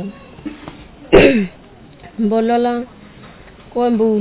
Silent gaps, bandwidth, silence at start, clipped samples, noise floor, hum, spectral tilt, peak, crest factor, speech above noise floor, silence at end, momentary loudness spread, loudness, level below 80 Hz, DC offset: none; 4 kHz; 0 s; under 0.1%; -40 dBFS; none; -10.5 dB/octave; 0 dBFS; 16 dB; 26 dB; 0 s; 23 LU; -15 LUFS; -36 dBFS; under 0.1%